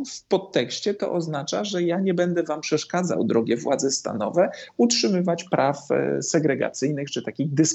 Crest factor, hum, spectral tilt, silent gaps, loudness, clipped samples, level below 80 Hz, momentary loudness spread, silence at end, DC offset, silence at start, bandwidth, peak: 18 dB; none; -4.5 dB/octave; none; -24 LUFS; under 0.1%; -74 dBFS; 5 LU; 0 s; under 0.1%; 0 s; 8.4 kHz; -6 dBFS